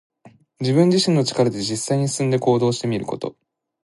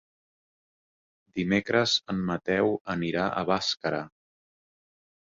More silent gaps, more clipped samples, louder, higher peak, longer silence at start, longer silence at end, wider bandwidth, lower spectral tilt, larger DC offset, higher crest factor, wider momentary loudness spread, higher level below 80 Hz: second, none vs 2.81-2.85 s; neither; first, -20 LUFS vs -27 LUFS; first, -4 dBFS vs -8 dBFS; second, 0.25 s vs 1.35 s; second, 0.55 s vs 1.15 s; first, 11.5 kHz vs 7.6 kHz; about the same, -5.5 dB/octave vs -4.5 dB/octave; neither; about the same, 18 dB vs 22 dB; about the same, 11 LU vs 9 LU; about the same, -60 dBFS vs -60 dBFS